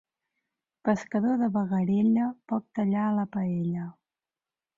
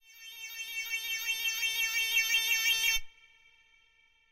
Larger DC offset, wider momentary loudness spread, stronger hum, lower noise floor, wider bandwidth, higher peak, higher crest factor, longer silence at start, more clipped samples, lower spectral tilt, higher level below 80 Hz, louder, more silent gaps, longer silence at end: neither; second, 8 LU vs 14 LU; neither; first, under -90 dBFS vs -67 dBFS; second, 7.4 kHz vs 16 kHz; first, -10 dBFS vs -16 dBFS; about the same, 18 dB vs 16 dB; first, 0.85 s vs 0.1 s; neither; first, -9 dB/octave vs 4 dB/octave; second, -68 dBFS vs -56 dBFS; about the same, -27 LUFS vs -29 LUFS; neither; second, 0.85 s vs 1.2 s